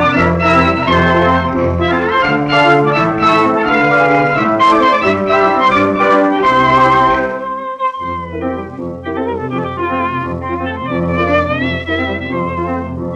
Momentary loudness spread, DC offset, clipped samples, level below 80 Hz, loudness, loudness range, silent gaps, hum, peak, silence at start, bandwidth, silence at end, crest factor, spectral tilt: 10 LU; under 0.1%; under 0.1%; -40 dBFS; -13 LUFS; 8 LU; none; none; 0 dBFS; 0 s; 10 kHz; 0 s; 12 dB; -6.5 dB/octave